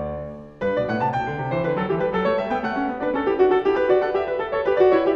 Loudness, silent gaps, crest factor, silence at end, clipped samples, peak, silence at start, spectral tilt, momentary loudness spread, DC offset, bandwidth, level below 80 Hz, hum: -22 LUFS; none; 16 dB; 0 s; under 0.1%; -4 dBFS; 0 s; -8 dB/octave; 7 LU; under 0.1%; 6.2 kHz; -48 dBFS; none